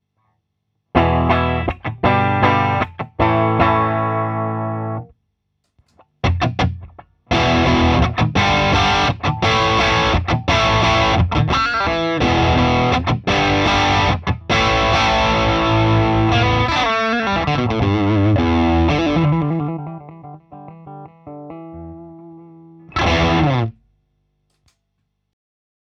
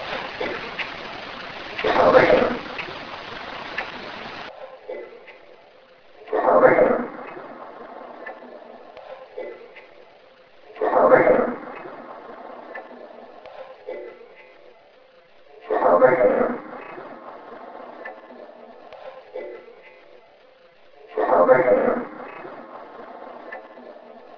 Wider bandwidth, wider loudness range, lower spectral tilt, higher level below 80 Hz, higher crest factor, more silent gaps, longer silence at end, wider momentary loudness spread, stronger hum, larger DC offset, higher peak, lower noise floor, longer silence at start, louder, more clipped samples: first, 8 kHz vs 5.4 kHz; second, 7 LU vs 18 LU; about the same, -6 dB/octave vs -6.5 dB/octave; first, -30 dBFS vs -56 dBFS; second, 18 dB vs 24 dB; neither; first, 2.3 s vs 0.2 s; second, 12 LU vs 26 LU; first, 50 Hz at -45 dBFS vs none; neither; about the same, 0 dBFS vs 0 dBFS; first, -72 dBFS vs -52 dBFS; first, 0.95 s vs 0 s; first, -16 LUFS vs -20 LUFS; neither